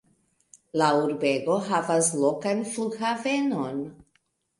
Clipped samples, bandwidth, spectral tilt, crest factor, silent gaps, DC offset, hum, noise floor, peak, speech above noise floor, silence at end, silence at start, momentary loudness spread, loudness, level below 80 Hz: under 0.1%; 11.5 kHz; -4 dB/octave; 18 dB; none; under 0.1%; none; -71 dBFS; -8 dBFS; 46 dB; 0.6 s; 0.75 s; 9 LU; -25 LUFS; -70 dBFS